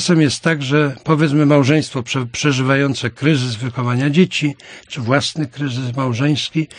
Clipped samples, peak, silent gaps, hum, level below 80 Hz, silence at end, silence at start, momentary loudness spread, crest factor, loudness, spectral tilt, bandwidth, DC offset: under 0.1%; 0 dBFS; none; none; -56 dBFS; 0 s; 0 s; 9 LU; 16 dB; -17 LUFS; -5.5 dB/octave; 10.5 kHz; under 0.1%